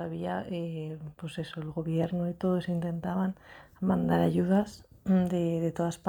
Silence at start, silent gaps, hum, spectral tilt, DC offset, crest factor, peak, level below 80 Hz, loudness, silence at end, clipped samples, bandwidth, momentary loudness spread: 0 s; none; none; -8 dB/octave; under 0.1%; 16 dB; -14 dBFS; -58 dBFS; -30 LUFS; 0 s; under 0.1%; 18.5 kHz; 13 LU